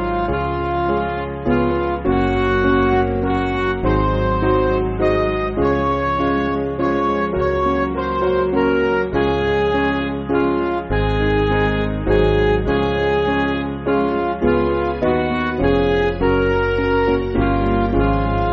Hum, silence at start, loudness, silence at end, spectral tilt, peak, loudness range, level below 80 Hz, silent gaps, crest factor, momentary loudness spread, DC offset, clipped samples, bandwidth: none; 0 s; -18 LUFS; 0 s; -5.5 dB/octave; -4 dBFS; 1 LU; -28 dBFS; none; 14 dB; 4 LU; under 0.1%; under 0.1%; 7 kHz